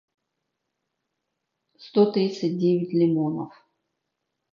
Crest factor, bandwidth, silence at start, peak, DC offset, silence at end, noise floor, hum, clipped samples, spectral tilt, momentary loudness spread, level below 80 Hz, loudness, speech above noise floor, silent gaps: 20 dB; 7.2 kHz; 1.8 s; -8 dBFS; under 0.1%; 1.05 s; -81 dBFS; none; under 0.1%; -8 dB/octave; 8 LU; -76 dBFS; -23 LUFS; 58 dB; none